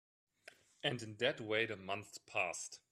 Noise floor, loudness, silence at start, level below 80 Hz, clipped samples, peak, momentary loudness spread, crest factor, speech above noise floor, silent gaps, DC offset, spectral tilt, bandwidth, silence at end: -64 dBFS; -40 LUFS; 0.85 s; -82 dBFS; under 0.1%; -20 dBFS; 7 LU; 22 dB; 23 dB; none; under 0.1%; -3 dB/octave; 14 kHz; 0.15 s